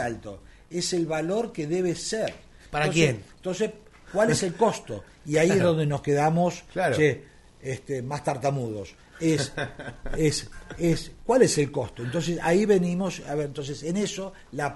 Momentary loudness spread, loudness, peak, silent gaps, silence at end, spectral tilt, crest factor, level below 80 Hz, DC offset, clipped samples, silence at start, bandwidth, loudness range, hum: 14 LU; -26 LUFS; -6 dBFS; none; 0 s; -5 dB/octave; 20 dB; -48 dBFS; under 0.1%; under 0.1%; 0 s; 11.5 kHz; 4 LU; none